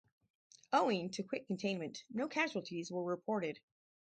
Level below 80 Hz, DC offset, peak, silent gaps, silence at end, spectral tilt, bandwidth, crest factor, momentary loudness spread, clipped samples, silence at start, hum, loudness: -84 dBFS; under 0.1%; -18 dBFS; none; 0.45 s; -5 dB/octave; 9 kHz; 20 dB; 9 LU; under 0.1%; 0.7 s; none; -38 LUFS